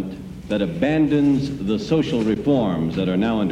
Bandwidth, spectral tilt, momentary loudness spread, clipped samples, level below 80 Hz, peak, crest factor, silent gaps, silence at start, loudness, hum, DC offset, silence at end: 10.5 kHz; -7.5 dB/octave; 7 LU; under 0.1%; -44 dBFS; -8 dBFS; 12 dB; none; 0 s; -20 LUFS; none; under 0.1%; 0 s